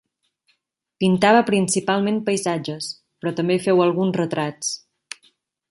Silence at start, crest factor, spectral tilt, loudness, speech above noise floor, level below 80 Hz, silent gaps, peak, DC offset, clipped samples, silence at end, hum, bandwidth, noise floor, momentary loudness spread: 1 s; 20 dB; -5 dB/octave; -20 LUFS; 51 dB; -64 dBFS; none; -2 dBFS; under 0.1%; under 0.1%; 0.95 s; none; 11.5 kHz; -70 dBFS; 17 LU